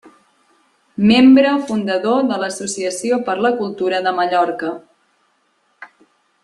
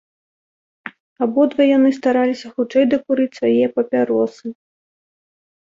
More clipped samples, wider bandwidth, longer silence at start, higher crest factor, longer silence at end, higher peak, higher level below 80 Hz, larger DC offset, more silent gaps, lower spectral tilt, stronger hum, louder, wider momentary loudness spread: neither; first, 11.5 kHz vs 7.6 kHz; first, 1 s vs 0.85 s; about the same, 16 dB vs 14 dB; second, 0.6 s vs 1.1 s; about the same, -2 dBFS vs -4 dBFS; first, -58 dBFS vs -66 dBFS; neither; second, none vs 1.00-1.16 s; second, -4.5 dB/octave vs -6 dB/octave; neither; about the same, -16 LUFS vs -17 LUFS; second, 12 LU vs 19 LU